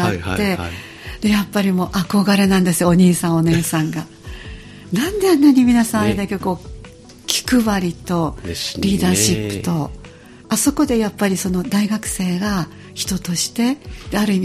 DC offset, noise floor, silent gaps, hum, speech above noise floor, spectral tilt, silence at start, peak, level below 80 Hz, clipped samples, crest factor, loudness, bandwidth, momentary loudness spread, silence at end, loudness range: under 0.1%; -39 dBFS; none; none; 22 dB; -5 dB/octave; 0 s; 0 dBFS; -38 dBFS; under 0.1%; 18 dB; -17 LUFS; 15.5 kHz; 15 LU; 0 s; 4 LU